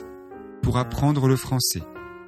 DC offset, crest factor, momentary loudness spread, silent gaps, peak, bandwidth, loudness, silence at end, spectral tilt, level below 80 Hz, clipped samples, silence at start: under 0.1%; 16 dB; 20 LU; none; -8 dBFS; 14.5 kHz; -23 LUFS; 0 s; -5 dB/octave; -42 dBFS; under 0.1%; 0 s